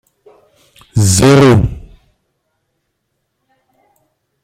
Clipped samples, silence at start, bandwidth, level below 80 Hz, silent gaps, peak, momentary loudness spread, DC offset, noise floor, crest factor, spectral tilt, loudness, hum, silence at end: under 0.1%; 0.95 s; 16 kHz; -34 dBFS; none; 0 dBFS; 14 LU; under 0.1%; -69 dBFS; 16 dB; -5.5 dB/octave; -10 LUFS; none; 2.6 s